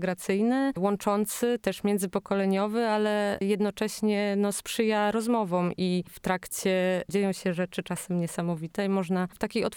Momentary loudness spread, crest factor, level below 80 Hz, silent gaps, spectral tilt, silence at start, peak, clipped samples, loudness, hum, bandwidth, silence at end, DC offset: 5 LU; 18 dB; -62 dBFS; none; -5.5 dB/octave; 0 s; -10 dBFS; under 0.1%; -28 LUFS; none; 19.5 kHz; 0 s; under 0.1%